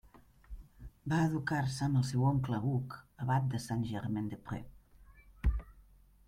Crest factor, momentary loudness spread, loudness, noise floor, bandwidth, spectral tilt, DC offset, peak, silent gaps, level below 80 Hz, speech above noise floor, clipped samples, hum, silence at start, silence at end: 16 dB; 17 LU; -35 LUFS; -61 dBFS; 14 kHz; -7 dB/octave; under 0.1%; -18 dBFS; none; -46 dBFS; 28 dB; under 0.1%; none; 0.5 s; 0.45 s